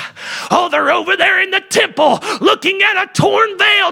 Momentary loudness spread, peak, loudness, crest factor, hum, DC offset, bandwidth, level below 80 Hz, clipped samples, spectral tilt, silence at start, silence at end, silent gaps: 4 LU; 0 dBFS; -12 LUFS; 14 dB; none; under 0.1%; 17 kHz; -56 dBFS; under 0.1%; -3 dB/octave; 0 s; 0 s; none